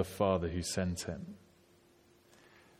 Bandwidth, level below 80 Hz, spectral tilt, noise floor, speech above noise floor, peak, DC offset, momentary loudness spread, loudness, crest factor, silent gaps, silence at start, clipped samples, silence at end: 16.5 kHz; -56 dBFS; -5 dB/octave; -65 dBFS; 30 dB; -16 dBFS; under 0.1%; 17 LU; -35 LUFS; 22 dB; none; 0 s; under 0.1%; 1.45 s